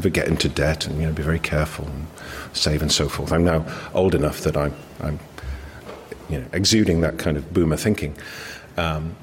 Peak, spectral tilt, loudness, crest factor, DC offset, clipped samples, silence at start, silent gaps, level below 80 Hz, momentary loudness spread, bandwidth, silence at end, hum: -6 dBFS; -5 dB/octave; -22 LUFS; 18 dB; under 0.1%; under 0.1%; 0 s; none; -34 dBFS; 16 LU; 16.5 kHz; 0 s; none